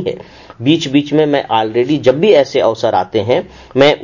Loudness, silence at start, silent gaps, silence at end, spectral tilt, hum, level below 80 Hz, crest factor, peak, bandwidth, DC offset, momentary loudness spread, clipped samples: -13 LUFS; 0 s; none; 0 s; -6 dB/octave; none; -48 dBFS; 12 dB; 0 dBFS; 7.4 kHz; under 0.1%; 8 LU; under 0.1%